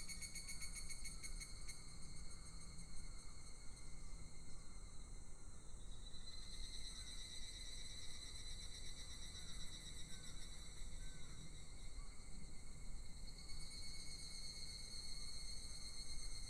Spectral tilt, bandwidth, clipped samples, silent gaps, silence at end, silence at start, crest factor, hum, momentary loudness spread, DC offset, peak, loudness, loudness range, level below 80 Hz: -2 dB/octave; 14 kHz; under 0.1%; none; 0 s; 0 s; 14 dB; none; 8 LU; under 0.1%; -34 dBFS; -54 LUFS; 6 LU; -54 dBFS